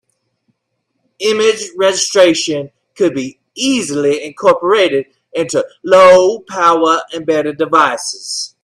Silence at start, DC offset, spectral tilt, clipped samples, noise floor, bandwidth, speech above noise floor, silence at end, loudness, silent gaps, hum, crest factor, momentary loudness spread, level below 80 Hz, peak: 1.2 s; under 0.1%; -3 dB/octave; under 0.1%; -70 dBFS; 13 kHz; 57 dB; 0.15 s; -13 LUFS; none; none; 14 dB; 12 LU; -58 dBFS; 0 dBFS